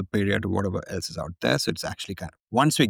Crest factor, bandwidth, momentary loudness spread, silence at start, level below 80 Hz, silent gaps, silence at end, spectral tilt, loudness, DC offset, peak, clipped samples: 18 dB; 19 kHz; 10 LU; 0 s; -52 dBFS; 2.40-2.44 s; 0 s; -4.5 dB/octave; -27 LUFS; under 0.1%; -8 dBFS; under 0.1%